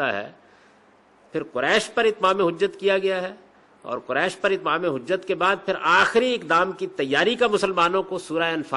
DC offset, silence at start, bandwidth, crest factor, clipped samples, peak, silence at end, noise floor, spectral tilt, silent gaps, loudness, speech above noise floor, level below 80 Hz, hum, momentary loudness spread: under 0.1%; 0 s; 11.5 kHz; 16 dB; under 0.1%; -6 dBFS; 0 s; -56 dBFS; -4 dB/octave; none; -22 LUFS; 33 dB; -62 dBFS; none; 11 LU